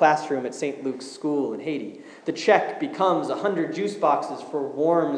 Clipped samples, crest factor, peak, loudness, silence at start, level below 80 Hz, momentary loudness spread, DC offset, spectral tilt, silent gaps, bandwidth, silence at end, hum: under 0.1%; 20 dB; -4 dBFS; -25 LUFS; 0 s; -88 dBFS; 11 LU; under 0.1%; -5 dB/octave; none; 10.5 kHz; 0 s; none